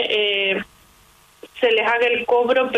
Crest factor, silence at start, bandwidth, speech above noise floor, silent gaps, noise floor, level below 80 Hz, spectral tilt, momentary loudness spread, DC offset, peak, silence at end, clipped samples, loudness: 16 dB; 0 s; 12.5 kHz; 35 dB; none; -53 dBFS; -60 dBFS; -4 dB/octave; 6 LU; under 0.1%; -4 dBFS; 0 s; under 0.1%; -18 LUFS